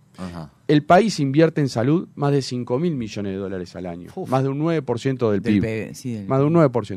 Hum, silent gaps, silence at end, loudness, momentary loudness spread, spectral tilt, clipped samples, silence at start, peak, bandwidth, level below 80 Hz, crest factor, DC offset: none; none; 0 s; -21 LUFS; 16 LU; -7 dB/octave; under 0.1%; 0.2 s; -2 dBFS; 13 kHz; -54 dBFS; 18 dB; under 0.1%